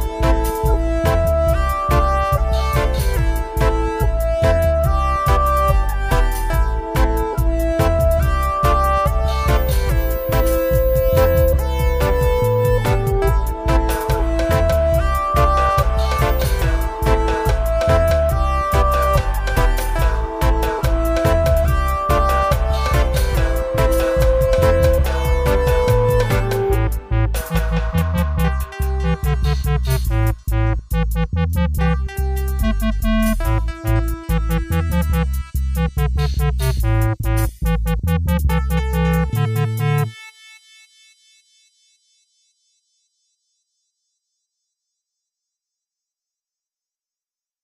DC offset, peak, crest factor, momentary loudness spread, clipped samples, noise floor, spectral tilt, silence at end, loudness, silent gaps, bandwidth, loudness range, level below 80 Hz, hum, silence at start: under 0.1%; -2 dBFS; 14 dB; 5 LU; under 0.1%; under -90 dBFS; -6.5 dB/octave; 7.35 s; -18 LUFS; none; 16 kHz; 3 LU; -20 dBFS; none; 0 s